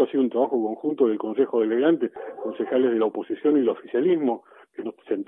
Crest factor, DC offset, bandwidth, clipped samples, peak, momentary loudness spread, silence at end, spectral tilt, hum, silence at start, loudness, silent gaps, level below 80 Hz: 16 dB; under 0.1%; 3.8 kHz; under 0.1%; -8 dBFS; 12 LU; 0.05 s; -9.5 dB/octave; none; 0 s; -24 LUFS; none; -78 dBFS